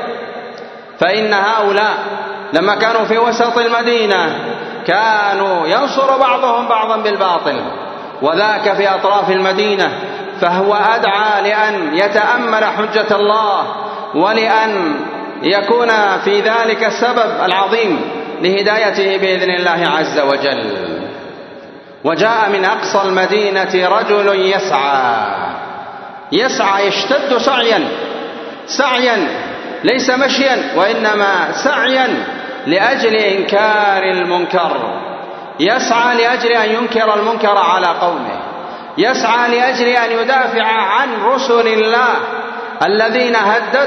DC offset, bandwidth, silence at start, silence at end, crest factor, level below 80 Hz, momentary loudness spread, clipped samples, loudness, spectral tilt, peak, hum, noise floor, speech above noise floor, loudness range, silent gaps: under 0.1%; 6.4 kHz; 0 s; 0 s; 14 dB; -64 dBFS; 11 LU; under 0.1%; -13 LUFS; -3.5 dB/octave; 0 dBFS; none; -34 dBFS; 21 dB; 2 LU; none